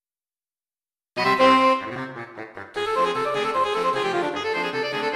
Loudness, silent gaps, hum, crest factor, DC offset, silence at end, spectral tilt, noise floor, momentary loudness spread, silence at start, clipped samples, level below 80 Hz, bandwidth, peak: -22 LUFS; none; none; 18 dB; under 0.1%; 0 s; -4 dB/octave; under -90 dBFS; 18 LU; 1.15 s; under 0.1%; -60 dBFS; 13.5 kHz; -6 dBFS